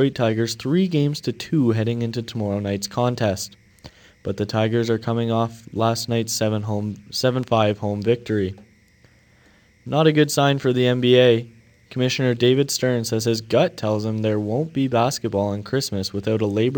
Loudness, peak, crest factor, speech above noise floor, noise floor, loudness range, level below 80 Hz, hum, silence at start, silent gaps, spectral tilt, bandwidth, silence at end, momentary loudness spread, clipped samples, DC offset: -21 LUFS; -4 dBFS; 18 dB; 34 dB; -55 dBFS; 5 LU; -58 dBFS; none; 0 s; none; -5.5 dB/octave; 19 kHz; 0 s; 8 LU; under 0.1%; under 0.1%